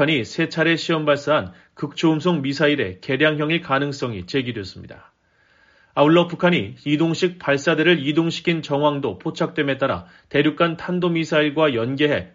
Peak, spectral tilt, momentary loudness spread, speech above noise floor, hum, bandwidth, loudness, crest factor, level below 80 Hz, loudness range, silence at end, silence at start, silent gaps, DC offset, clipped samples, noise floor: -2 dBFS; -4 dB/octave; 8 LU; 39 dB; none; 7.6 kHz; -20 LUFS; 18 dB; -58 dBFS; 3 LU; 0.1 s; 0 s; none; under 0.1%; under 0.1%; -59 dBFS